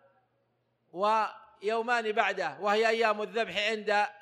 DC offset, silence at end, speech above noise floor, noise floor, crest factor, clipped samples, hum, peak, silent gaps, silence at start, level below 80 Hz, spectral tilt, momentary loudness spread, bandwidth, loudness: under 0.1%; 0.1 s; 46 dB; -75 dBFS; 20 dB; under 0.1%; none; -10 dBFS; none; 0.95 s; -78 dBFS; -3 dB/octave; 7 LU; 12.5 kHz; -29 LUFS